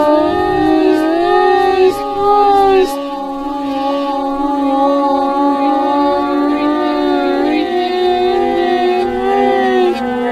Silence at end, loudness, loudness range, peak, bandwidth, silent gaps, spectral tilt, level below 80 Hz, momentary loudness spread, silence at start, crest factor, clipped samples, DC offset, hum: 0 s; -13 LUFS; 2 LU; 0 dBFS; 14 kHz; none; -5.5 dB/octave; -40 dBFS; 6 LU; 0 s; 12 dB; under 0.1%; under 0.1%; none